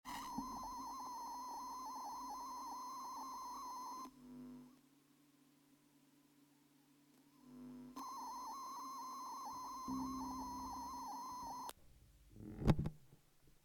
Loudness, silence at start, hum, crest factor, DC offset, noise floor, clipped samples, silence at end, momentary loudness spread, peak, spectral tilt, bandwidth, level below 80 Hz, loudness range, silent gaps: -47 LUFS; 0.05 s; none; 30 dB; under 0.1%; -72 dBFS; under 0.1%; 0.05 s; 12 LU; -18 dBFS; -5.5 dB/octave; 19 kHz; -60 dBFS; 15 LU; none